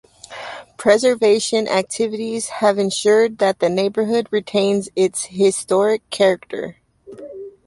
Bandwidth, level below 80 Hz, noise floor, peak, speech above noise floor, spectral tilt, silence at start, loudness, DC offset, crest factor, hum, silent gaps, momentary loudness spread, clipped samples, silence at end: 11.5 kHz; -62 dBFS; -38 dBFS; -2 dBFS; 21 dB; -4 dB/octave; 0.3 s; -18 LUFS; under 0.1%; 16 dB; none; none; 18 LU; under 0.1%; 0.15 s